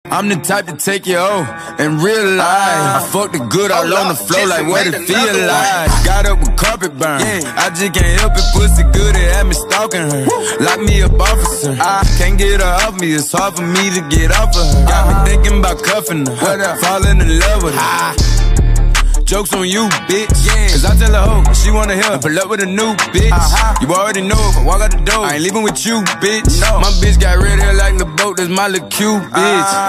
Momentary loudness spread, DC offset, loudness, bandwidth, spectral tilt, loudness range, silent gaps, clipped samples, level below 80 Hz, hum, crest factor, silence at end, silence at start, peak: 4 LU; under 0.1%; -13 LUFS; 15.5 kHz; -4 dB/octave; 1 LU; none; under 0.1%; -14 dBFS; none; 12 dB; 0 s; 0.05 s; 0 dBFS